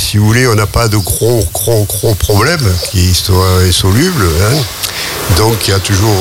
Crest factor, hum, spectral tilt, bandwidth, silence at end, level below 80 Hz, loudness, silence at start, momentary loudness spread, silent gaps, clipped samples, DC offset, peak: 10 dB; none; -4.5 dB/octave; 17 kHz; 0 s; -24 dBFS; -10 LUFS; 0 s; 4 LU; none; under 0.1%; under 0.1%; 0 dBFS